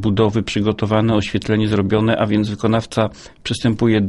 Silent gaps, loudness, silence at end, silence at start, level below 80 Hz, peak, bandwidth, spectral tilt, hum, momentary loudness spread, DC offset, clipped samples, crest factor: none; -18 LUFS; 0 s; 0 s; -42 dBFS; -2 dBFS; 11.5 kHz; -6.5 dB/octave; none; 5 LU; under 0.1%; under 0.1%; 14 dB